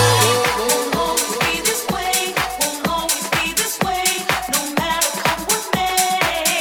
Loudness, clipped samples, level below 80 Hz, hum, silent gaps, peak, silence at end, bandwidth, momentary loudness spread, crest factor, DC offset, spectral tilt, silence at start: -18 LUFS; under 0.1%; -44 dBFS; none; none; -2 dBFS; 0 s; 19 kHz; 4 LU; 16 dB; under 0.1%; -2 dB/octave; 0 s